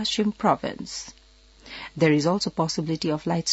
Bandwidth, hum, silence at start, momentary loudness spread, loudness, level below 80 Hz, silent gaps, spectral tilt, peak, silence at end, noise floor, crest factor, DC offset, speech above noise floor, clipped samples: 8 kHz; none; 0 s; 17 LU; -25 LUFS; -56 dBFS; none; -5 dB/octave; -6 dBFS; 0 s; -52 dBFS; 20 dB; under 0.1%; 27 dB; under 0.1%